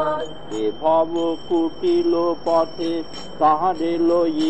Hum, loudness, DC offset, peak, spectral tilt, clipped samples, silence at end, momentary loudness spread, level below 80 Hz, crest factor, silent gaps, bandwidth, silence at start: none; -21 LUFS; 2%; -6 dBFS; -6 dB/octave; under 0.1%; 0 s; 7 LU; -52 dBFS; 14 dB; none; 8.4 kHz; 0 s